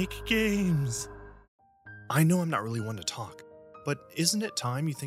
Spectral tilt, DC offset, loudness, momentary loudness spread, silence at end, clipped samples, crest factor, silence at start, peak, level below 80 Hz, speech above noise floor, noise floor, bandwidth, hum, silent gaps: -4.5 dB/octave; under 0.1%; -29 LUFS; 16 LU; 0 s; under 0.1%; 22 dB; 0 s; -8 dBFS; -52 dBFS; 22 dB; -50 dBFS; 15.5 kHz; none; 1.48-1.59 s